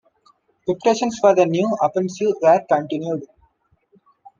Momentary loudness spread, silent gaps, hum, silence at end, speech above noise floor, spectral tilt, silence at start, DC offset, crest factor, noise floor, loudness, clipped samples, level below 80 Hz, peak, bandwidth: 11 LU; none; none; 1.15 s; 44 dB; -5.5 dB/octave; 0.65 s; under 0.1%; 18 dB; -62 dBFS; -19 LUFS; under 0.1%; -66 dBFS; -2 dBFS; 7.6 kHz